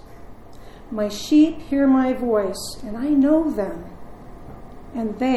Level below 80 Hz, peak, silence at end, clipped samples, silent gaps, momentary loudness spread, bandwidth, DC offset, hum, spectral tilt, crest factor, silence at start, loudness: -44 dBFS; -6 dBFS; 0 s; under 0.1%; none; 24 LU; 13 kHz; under 0.1%; none; -5.5 dB/octave; 16 dB; 0.05 s; -20 LUFS